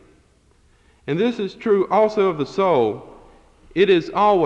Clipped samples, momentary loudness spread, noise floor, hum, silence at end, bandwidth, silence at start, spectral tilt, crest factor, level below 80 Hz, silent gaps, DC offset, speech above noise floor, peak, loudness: under 0.1%; 10 LU; -56 dBFS; none; 0 s; 7.8 kHz; 1.05 s; -7 dB/octave; 16 dB; -54 dBFS; none; under 0.1%; 39 dB; -4 dBFS; -19 LUFS